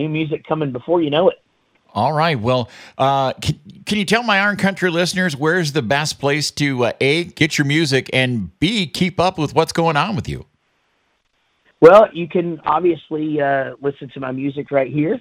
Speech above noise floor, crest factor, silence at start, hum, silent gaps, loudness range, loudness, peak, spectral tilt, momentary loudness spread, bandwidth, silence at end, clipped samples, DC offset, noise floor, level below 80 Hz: 48 dB; 18 dB; 0 s; none; none; 3 LU; -17 LUFS; 0 dBFS; -5 dB/octave; 9 LU; 15.5 kHz; 0 s; under 0.1%; under 0.1%; -65 dBFS; -50 dBFS